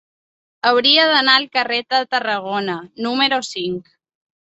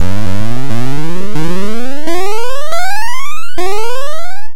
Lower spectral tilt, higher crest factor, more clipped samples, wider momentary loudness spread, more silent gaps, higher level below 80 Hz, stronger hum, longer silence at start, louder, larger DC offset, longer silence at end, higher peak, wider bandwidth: second, -3 dB/octave vs -5 dB/octave; about the same, 18 dB vs 16 dB; second, under 0.1% vs 0.4%; first, 13 LU vs 4 LU; neither; second, -68 dBFS vs -36 dBFS; neither; first, 0.65 s vs 0 s; first, -16 LUFS vs -20 LUFS; second, under 0.1% vs 80%; first, 0.7 s vs 0 s; about the same, 0 dBFS vs 0 dBFS; second, 8.2 kHz vs 17.5 kHz